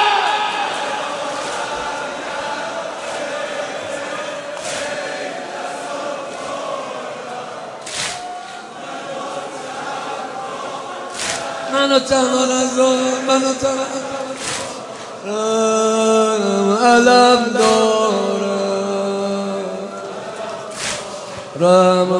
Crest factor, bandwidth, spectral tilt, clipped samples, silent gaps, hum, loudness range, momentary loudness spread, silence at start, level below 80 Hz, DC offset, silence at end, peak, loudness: 18 dB; 11.5 kHz; -3.5 dB/octave; under 0.1%; none; none; 12 LU; 14 LU; 0 s; -58 dBFS; under 0.1%; 0 s; 0 dBFS; -19 LUFS